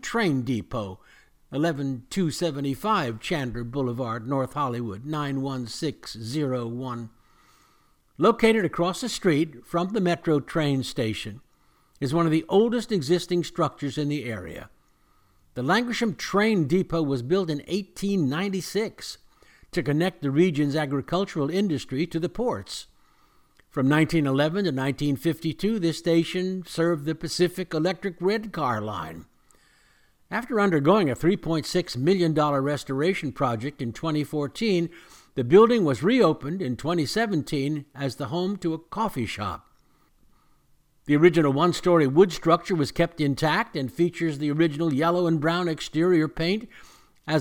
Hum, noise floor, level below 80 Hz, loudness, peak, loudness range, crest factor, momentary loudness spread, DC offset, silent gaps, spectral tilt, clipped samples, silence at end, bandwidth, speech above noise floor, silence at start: none; -62 dBFS; -52 dBFS; -25 LUFS; -4 dBFS; 6 LU; 20 dB; 11 LU; under 0.1%; none; -6 dB/octave; under 0.1%; 0 s; 17.5 kHz; 38 dB; 0.05 s